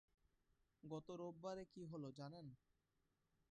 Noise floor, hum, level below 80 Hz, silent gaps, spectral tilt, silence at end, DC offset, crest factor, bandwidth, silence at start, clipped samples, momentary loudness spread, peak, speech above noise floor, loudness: -87 dBFS; none; -82 dBFS; none; -7 dB/octave; 0.95 s; under 0.1%; 18 dB; 9.6 kHz; 0.85 s; under 0.1%; 9 LU; -38 dBFS; 33 dB; -55 LUFS